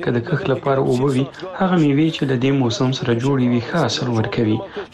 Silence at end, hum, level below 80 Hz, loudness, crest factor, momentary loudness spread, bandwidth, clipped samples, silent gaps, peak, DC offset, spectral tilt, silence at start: 0.05 s; none; -50 dBFS; -19 LUFS; 10 dB; 4 LU; 11 kHz; under 0.1%; none; -8 dBFS; under 0.1%; -6.5 dB/octave; 0 s